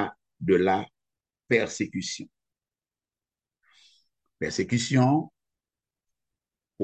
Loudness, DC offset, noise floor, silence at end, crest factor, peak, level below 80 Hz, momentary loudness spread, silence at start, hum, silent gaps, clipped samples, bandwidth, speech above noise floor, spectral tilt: -26 LUFS; under 0.1%; under -90 dBFS; 0 s; 22 dB; -6 dBFS; -60 dBFS; 15 LU; 0 s; none; none; under 0.1%; 9 kHz; over 65 dB; -5.5 dB/octave